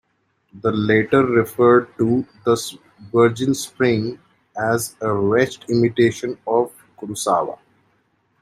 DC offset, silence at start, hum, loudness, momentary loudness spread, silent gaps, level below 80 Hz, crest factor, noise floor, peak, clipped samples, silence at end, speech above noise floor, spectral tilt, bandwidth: under 0.1%; 0.55 s; none; -19 LUFS; 12 LU; none; -56 dBFS; 18 dB; -66 dBFS; -2 dBFS; under 0.1%; 0.85 s; 48 dB; -5.5 dB/octave; 16 kHz